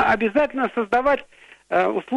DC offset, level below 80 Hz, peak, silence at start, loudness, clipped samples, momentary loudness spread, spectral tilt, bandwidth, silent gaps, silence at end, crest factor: under 0.1%; -50 dBFS; -8 dBFS; 0 s; -21 LUFS; under 0.1%; 5 LU; -6 dB/octave; 11 kHz; none; 0 s; 14 dB